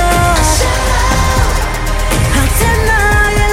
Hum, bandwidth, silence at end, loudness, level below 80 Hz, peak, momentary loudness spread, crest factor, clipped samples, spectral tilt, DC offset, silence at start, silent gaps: none; 16.5 kHz; 0 s; -12 LUFS; -14 dBFS; 0 dBFS; 5 LU; 10 dB; under 0.1%; -4 dB/octave; under 0.1%; 0 s; none